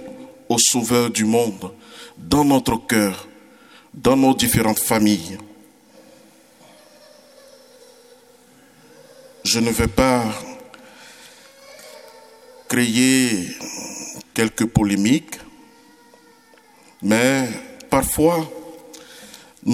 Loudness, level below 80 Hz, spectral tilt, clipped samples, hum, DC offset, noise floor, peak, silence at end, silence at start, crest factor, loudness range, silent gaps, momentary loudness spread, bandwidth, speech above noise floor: -19 LUFS; -44 dBFS; -4 dB/octave; under 0.1%; none; under 0.1%; -51 dBFS; 0 dBFS; 0 s; 0 s; 20 dB; 5 LU; none; 24 LU; 17.5 kHz; 33 dB